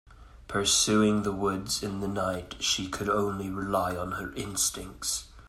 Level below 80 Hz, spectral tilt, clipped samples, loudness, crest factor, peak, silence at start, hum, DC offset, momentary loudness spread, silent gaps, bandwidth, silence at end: -50 dBFS; -3 dB/octave; under 0.1%; -28 LUFS; 18 dB; -12 dBFS; 0.1 s; none; under 0.1%; 11 LU; none; 16 kHz; 0 s